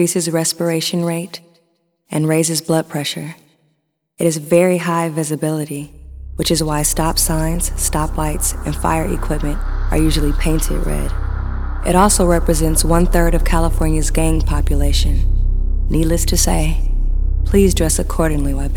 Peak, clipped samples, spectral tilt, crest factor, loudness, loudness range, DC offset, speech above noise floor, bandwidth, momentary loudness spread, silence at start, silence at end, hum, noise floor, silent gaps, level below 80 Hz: 0 dBFS; under 0.1%; -4.5 dB/octave; 16 dB; -17 LUFS; 4 LU; under 0.1%; 51 dB; 18.5 kHz; 9 LU; 0 s; 0 s; none; -66 dBFS; none; -18 dBFS